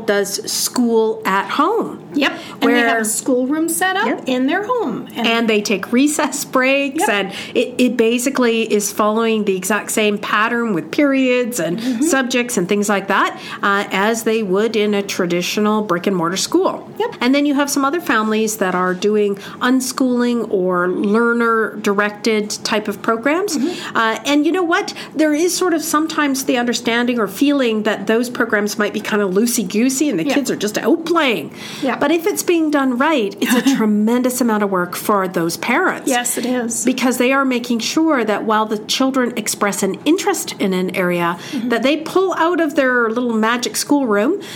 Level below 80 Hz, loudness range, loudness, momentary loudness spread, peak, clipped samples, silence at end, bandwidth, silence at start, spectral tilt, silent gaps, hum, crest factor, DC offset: -64 dBFS; 1 LU; -17 LUFS; 4 LU; -2 dBFS; under 0.1%; 0 s; 18.5 kHz; 0 s; -3.5 dB/octave; none; none; 14 dB; under 0.1%